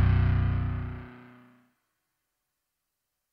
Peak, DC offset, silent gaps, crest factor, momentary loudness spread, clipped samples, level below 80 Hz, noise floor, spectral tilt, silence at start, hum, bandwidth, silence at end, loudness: -14 dBFS; under 0.1%; none; 16 dB; 19 LU; under 0.1%; -36 dBFS; -83 dBFS; -10 dB/octave; 0 s; none; 4.9 kHz; 2.15 s; -28 LUFS